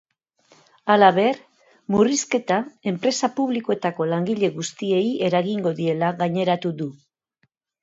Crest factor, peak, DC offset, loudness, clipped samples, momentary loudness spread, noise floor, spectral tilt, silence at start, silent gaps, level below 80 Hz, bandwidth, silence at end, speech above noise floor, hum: 22 dB; 0 dBFS; under 0.1%; -22 LUFS; under 0.1%; 12 LU; -70 dBFS; -5 dB/octave; 0.85 s; none; -66 dBFS; 8 kHz; 0.9 s; 49 dB; none